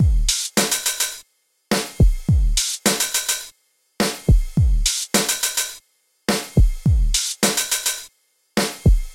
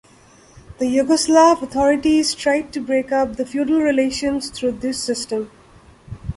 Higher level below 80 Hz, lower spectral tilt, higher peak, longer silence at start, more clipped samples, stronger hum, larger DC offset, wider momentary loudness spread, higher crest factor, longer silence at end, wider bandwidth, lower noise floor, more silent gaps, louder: first, -22 dBFS vs -46 dBFS; about the same, -3.5 dB/octave vs -4 dB/octave; about the same, -4 dBFS vs -2 dBFS; second, 0 s vs 0.7 s; neither; neither; neither; second, 6 LU vs 11 LU; about the same, 16 dB vs 16 dB; about the same, 0 s vs 0.05 s; first, 17 kHz vs 11.5 kHz; first, -61 dBFS vs -49 dBFS; neither; about the same, -20 LUFS vs -18 LUFS